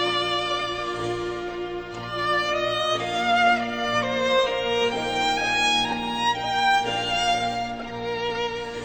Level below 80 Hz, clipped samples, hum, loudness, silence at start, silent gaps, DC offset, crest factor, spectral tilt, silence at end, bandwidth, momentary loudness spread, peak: -50 dBFS; under 0.1%; none; -24 LUFS; 0 s; none; under 0.1%; 16 dB; -3 dB/octave; 0 s; over 20 kHz; 10 LU; -8 dBFS